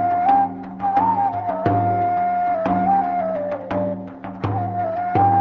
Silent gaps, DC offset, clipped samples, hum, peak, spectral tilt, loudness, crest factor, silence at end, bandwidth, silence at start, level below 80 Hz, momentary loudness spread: none; under 0.1%; under 0.1%; none; -4 dBFS; -10 dB/octave; -20 LUFS; 14 dB; 0 s; 5.8 kHz; 0 s; -48 dBFS; 8 LU